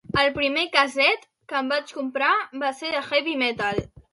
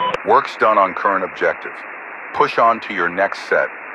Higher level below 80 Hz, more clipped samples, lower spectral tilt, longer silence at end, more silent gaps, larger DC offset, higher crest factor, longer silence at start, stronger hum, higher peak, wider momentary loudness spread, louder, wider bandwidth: first, -54 dBFS vs -62 dBFS; neither; about the same, -4 dB/octave vs -4.5 dB/octave; first, 0.15 s vs 0 s; neither; neither; first, 22 dB vs 16 dB; first, 0.15 s vs 0 s; neither; second, -4 dBFS vs 0 dBFS; second, 9 LU vs 14 LU; second, -23 LUFS vs -17 LUFS; about the same, 11.5 kHz vs 10.5 kHz